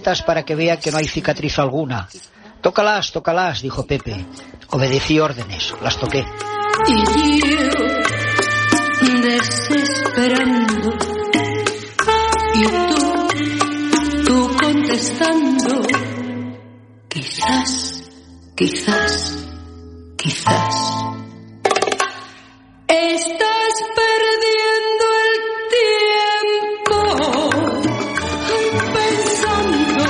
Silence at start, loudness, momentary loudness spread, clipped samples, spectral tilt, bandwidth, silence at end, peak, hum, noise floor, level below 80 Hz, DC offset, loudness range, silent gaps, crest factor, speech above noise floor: 0 s; -17 LUFS; 10 LU; under 0.1%; -4 dB/octave; 11.5 kHz; 0 s; 0 dBFS; none; -45 dBFS; -40 dBFS; under 0.1%; 5 LU; none; 16 dB; 27 dB